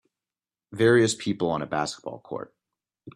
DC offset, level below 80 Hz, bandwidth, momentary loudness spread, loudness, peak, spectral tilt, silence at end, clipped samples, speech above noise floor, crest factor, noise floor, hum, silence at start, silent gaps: under 0.1%; -64 dBFS; 11.5 kHz; 18 LU; -24 LUFS; -8 dBFS; -5 dB/octave; 0.05 s; under 0.1%; over 65 dB; 20 dB; under -90 dBFS; none; 0.7 s; none